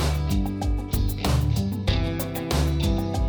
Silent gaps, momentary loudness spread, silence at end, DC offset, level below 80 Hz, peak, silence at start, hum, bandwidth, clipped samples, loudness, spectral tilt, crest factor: none; 4 LU; 0 s; under 0.1%; -28 dBFS; -10 dBFS; 0 s; none; over 20 kHz; under 0.1%; -25 LUFS; -6 dB/octave; 14 dB